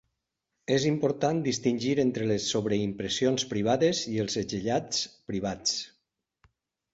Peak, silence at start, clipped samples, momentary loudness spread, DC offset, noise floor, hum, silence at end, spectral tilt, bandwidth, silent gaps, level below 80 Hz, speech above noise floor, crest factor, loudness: -12 dBFS; 0.7 s; under 0.1%; 7 LU; under 0.1%; -83 dBFS; none; 1.05 s; -4.5 dB/octave; 8.2 kHz; none; -60 dBFS; 55 dB; 18 dB; -28 LUFS